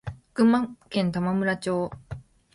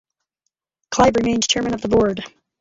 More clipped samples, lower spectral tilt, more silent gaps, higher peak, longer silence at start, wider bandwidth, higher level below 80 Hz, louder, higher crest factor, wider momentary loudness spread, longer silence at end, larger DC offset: neither; first, -7 dB/octave vs -3.5 dB/octave; neither; second, -8 dBFS vs -2 dBFS; second, 0.05 s vs 0.9 s; first, 11.5 kHz vs 8 kHz; second, -54 dBFS vs -44 dBFS; second, -25 LUFS vs -18 LUFS; about the same, 18 dB vs 18 dB; first, 19 LU vs 12 LU; about the same, 0.35 s vs 0.3 s; neither